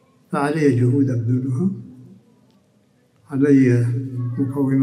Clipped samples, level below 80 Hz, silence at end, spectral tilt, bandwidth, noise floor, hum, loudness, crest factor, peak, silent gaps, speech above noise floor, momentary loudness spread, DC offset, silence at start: under 0.1%; -62 dBFS; 0 s; -9 dB/octave; 11 kHz; -59 dBFS; none; -19 LUFS; 16 dB; -4 dBFS; none; 41 dB; 11 LU; under 0.1%; 0.3 s